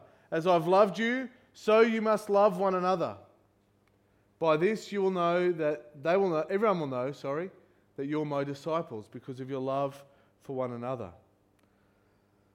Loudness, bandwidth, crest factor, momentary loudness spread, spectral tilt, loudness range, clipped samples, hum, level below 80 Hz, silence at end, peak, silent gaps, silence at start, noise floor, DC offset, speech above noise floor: -29 LUFS; 15.5 kHz; 20 dB; 16 LU; -6.5 dB/octave; 10 LU; under 0.1%; none; -76 dBFS; 1.45 s; -10 dBFS; none; 0.3 s; -68 dBFS; under 0.1%; 39 dB